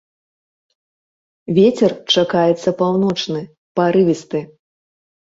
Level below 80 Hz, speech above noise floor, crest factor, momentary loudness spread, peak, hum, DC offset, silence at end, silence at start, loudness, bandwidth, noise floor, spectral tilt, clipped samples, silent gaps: -58 dBFS; over 74 dB; 16 dB; 12 LU; -2 dBFS; none; under 0.1%; 0.85 s; 1.5 s; -17 LUFS; 8 kHz; under -90 dBFS; -6 dB/octave; under 0.1%; 3.58-3.75 s